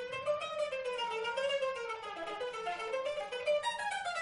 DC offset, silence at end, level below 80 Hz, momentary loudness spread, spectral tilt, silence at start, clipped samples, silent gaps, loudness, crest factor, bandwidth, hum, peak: under 0.1%; 0 s; -72 dBFS; 6 LU; -1.5 dB/octave; 0 s; under 0.1%; none; -36 LUFS; 14 dB; 10.5 kHz; none; -22 dBFS